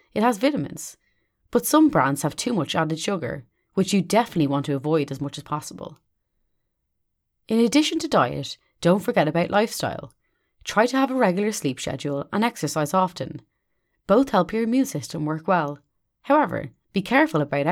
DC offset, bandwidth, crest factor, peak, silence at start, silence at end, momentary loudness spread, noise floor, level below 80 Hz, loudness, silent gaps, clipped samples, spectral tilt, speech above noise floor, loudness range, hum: under 0.1%; 17.5 kHz; 18 dB; -4 dBFS; 0.15 s; 0 s; 13 LU; -76 dBFS; -58 dBFS; -23 LUFS; none; under 0.1%; -5 dB/octave; 53 dB; 3 LU; none